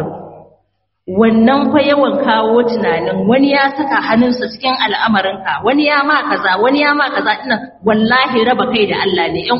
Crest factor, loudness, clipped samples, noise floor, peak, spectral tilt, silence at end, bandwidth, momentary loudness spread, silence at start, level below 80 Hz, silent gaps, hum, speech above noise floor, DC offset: 12 dB; -13 LUFS; under 0.1%; -64 dBFS; 0 dBFS; -2.5 dB/octave; 0 s; 5.8 kHz; 6 LU; 0 s; -50 dBFS; none; none; 51 dB; under 0.1%